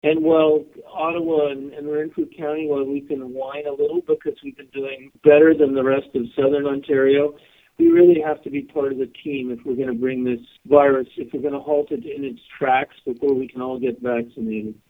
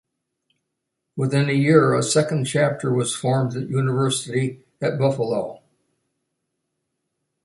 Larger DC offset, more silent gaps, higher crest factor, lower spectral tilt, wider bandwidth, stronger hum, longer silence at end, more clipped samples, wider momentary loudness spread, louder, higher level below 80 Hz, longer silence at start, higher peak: neither; neither; about the same, 20 dB vs 20 dB; first, -8.5 dB/octave vs -5.5 dB/octave; second, 3.9 kHz vs 11.5 kHz; neither; second, 0.15 s vs 1.9 s; neither; first, 14 LU vs 11 LU; about the same, -20 LUFS vs -21 LUFS; about the same, -60 dBFS vs -62 dBFS; second, 0.05 s vs 1.15 s; about the same, 0 dBFS vs -2 dBFS